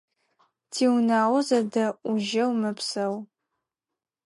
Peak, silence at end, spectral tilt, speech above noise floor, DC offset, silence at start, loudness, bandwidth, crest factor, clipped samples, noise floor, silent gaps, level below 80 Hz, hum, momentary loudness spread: -10 dBFS; 1.05 s; -4.5 dB/octave; 65 dB; under 0.1%; 0.7 s; -25 LUFS; 11.5 kHz; 16 dB; under 0.1%; -89 dBFS; none; -80 dBFS; none; 8 LU